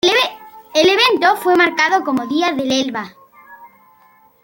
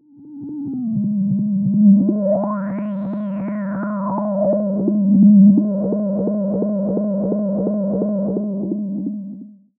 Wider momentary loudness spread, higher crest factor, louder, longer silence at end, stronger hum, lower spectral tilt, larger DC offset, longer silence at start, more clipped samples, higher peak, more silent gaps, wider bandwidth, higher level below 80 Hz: second, 9 LU vs 12 LU; about the same, 16 dB vs 14 dB; first, -15 LUFS vs -18 LUFS; first, 0.75 s vs 0.25 s; neither; second, -2.5 dB/octave vs -14.5 dB/octave; neither; second, 0.05 s vs 0.2 s; neither; about the same, -2 dBFS vs -4 dBFS; neither; first, 17 kHz vs 2.3 kHz; about the same, -60 dBFS vs -58 dBFS